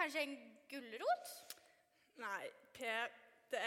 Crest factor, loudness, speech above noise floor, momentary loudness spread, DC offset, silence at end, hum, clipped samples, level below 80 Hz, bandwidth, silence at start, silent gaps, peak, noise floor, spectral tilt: 22 dB; -45 LUFS; 29 dB; 14 LU; under 0.1%; 0 s; none; under 0.1%; under -90 dBFS; 18 kHz; 0 s; none; -24 dBFS; -74 dBFS; -1.5 dB/octave